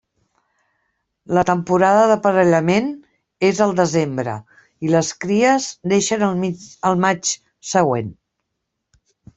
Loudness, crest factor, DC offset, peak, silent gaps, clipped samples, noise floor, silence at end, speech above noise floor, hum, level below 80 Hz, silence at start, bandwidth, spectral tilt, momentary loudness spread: -18 LUFS; 16 dB; under 0.1%; -2 dBFS; none; under 0.1%; -77 dBFS; 1.25 s; 60 dB; none; -58 dBFS; 1.3 s; 8.4 kHz; -5 dB/octave; 11 LU